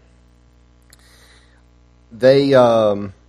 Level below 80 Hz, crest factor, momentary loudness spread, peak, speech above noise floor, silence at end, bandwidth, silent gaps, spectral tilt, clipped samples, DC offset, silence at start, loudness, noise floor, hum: -52 dBFS; 18 dB; 5 LU; 0 dBFS; 37 dB; 0.2 s; 11.5 kHz; none; -7 dB/octave; under 0.1%; under 0.1%; 2.15 s; -14 LUFS; -51 dBFS; 60 Hz at -50 dBFS